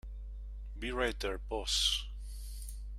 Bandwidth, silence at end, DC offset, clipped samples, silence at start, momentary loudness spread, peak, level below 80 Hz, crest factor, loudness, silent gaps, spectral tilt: 15.5 kHz; 0 s; under 0.1%; under 0.1%; 0.05 s; 18 LU; -18 dBFS; -42 dBFS; 20 dB; -34 LUFS; none; -2.5 dB/octave